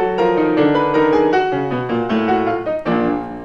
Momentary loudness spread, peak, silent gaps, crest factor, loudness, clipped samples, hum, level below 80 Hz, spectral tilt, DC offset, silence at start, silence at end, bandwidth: 6 LU; -4 dBFS; none; 14 dB; -17 LUFS; under 0.1%; none; -46 dBFS; -7.5 dB/octave; under 0.1%; 0 s; 0 s; 7.4 kHz